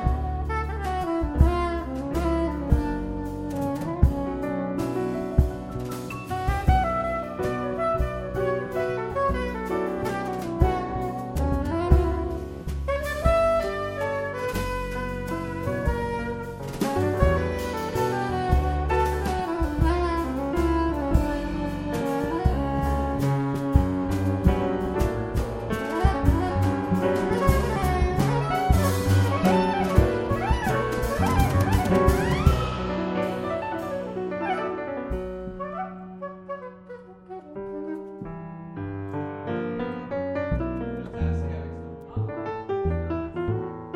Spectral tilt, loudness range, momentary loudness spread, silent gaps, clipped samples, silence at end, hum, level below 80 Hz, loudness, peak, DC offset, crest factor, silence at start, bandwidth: -7 dB/octave; 8 LU; 11 LU; none; under 0.1%; 0 s; none; -30 dBFS; -26 LUFS; -4 dBFS; under 0.1%; 20 dB; 0 s; 16.5 kHz